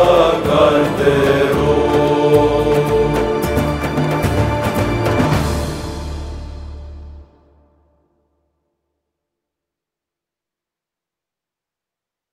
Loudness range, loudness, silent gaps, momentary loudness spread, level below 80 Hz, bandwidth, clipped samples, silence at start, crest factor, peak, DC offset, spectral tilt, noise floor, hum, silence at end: 17 LU; -15 LUFS; none; 17 LU; -32 dBFS; 16 kHz; under 0.1%; 0 s; 16 dB; 0 dBFS; under 0.1%; -6.5 dB/octave; -86 dBFS; none; 5.1 s